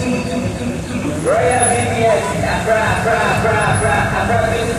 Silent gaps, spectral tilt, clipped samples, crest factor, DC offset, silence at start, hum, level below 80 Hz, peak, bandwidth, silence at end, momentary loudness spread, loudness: none; -4.5 dB/octave; under 0.1%; 14 dB; under 0.1%; 0 s; none; -34 dBFS; -2 dBFS; 14.5 kHz; 0 s; 7 LU; -16 LUFS